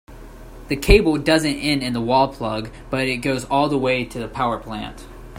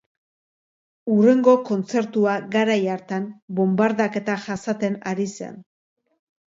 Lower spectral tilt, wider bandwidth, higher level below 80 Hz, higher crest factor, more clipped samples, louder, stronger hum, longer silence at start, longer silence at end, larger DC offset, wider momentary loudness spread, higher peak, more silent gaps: second, -5 dB/octave vs -6.5 dB/octave; first, 16 kHz vs 7.8 kHz; first, -32 dBFS vs -70 dBFS; about the same, 20 dB vs 20 dB; neither; about the same, -20 LUFS vs -21 LUFS; neither; second, 0.1 s vs 1.05 s; second, 0 s vs 0.85 s; neither; about the same, 13 LU vs 12 LU; first, 0 dBFS vs -4 dBFS; second, none vs 3.42-3.48 s